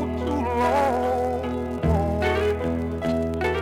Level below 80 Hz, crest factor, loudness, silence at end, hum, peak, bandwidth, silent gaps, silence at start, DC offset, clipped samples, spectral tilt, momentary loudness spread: -34 dBFS; 14 dB; -24 LUFS; 0 s; none; -10 dBFS; 16 kHz; none; 0 s; under 0.1%; under 0.1%; -7 dB/octave; 5 LU